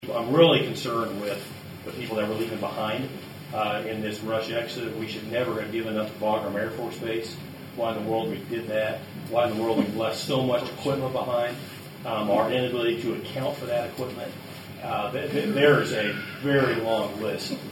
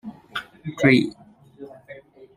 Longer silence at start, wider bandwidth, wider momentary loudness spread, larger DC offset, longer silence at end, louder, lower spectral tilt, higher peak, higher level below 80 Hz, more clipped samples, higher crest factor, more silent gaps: about the same, 0 s vs 0.05 s; first, 17.5 kHz vs 14.5 kHz; second, 13 LU vs 26 LU; neither; about the same, 0 s vs 0.1 s; second, -27 LUFS vs -21 LUFS; about the same, -5.5 dB/octave vs -6.5 dB/octave; second, -6 dBFS vs -2 dBFS; about the same, -66 dBFS vs -64 dBFS; neither; about the same, 22 dB vs 24 dB; neither